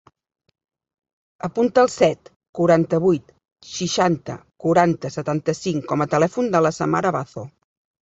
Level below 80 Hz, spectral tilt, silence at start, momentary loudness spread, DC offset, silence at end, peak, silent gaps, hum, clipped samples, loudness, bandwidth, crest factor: -58 dBFS; -6 dB/octave; 1.45 s; 16 LU; under 0.1%; 0.55 s; -2 dBFS; 2.36-2.40 s, 2.49-2.53 s, 3.52-3.56 s; none; under 0.1%; -20 LUFS; 8 kHz; 20 dB